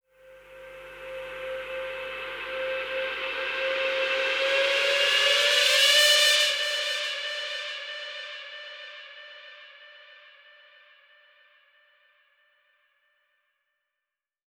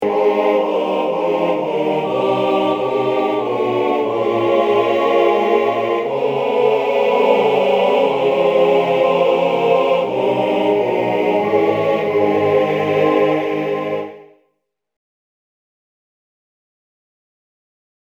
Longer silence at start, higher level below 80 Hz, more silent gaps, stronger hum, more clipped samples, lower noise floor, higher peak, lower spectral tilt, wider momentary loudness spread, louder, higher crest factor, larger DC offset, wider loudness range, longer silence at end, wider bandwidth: first, 0.25 s vs 0 s; about the same, -66 dBFS vs -62 dBFS; neither; neither; neither; first, -88 dBFS vs -71 dBFS; second, -6 dBFS vs 0 dBFS; second, 2 dB/octave vs -6.5 dB/octave; first, 24 LU vs 4 LU; second, -23 LUFS vs -16 LUFS; first, 22 dB vs 16 dB; neither; first, 19 LU vs 5 LU; first, 4.35 s vs 3.85 s; first, 19 kHz vs 8.4 kHz